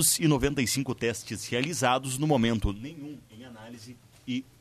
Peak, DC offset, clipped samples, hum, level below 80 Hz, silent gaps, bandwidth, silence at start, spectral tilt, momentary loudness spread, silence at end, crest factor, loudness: -10 dBFS; under 0.1%; under 0.1%; none; -44 dBFS; none; 14 kHz; 0 s; -4 dB/octave; 21 LU; 0.2 s; 18 dB; -27 LUFS